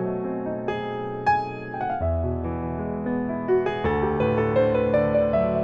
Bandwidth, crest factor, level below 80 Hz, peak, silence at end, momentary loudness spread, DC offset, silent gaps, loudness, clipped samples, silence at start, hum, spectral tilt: 7.4 kHz; 14 dB; -40 dBFS; -10 dBFS; 0 s; 8 LU; under 0.1%; none; -24 LUFS; under 0.1%; 0 s; none; -9 dB/octave